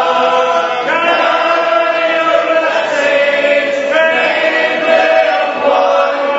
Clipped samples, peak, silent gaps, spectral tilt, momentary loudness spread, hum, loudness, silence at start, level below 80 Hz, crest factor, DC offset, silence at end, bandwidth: under 0.1%; 0 dBFS; none; -2.5 dB/octave; 3 LU; none; -11 LUFS; 0 s; -60 dBFS; 12 dB; under 0.1%; 0 s; 8 kHz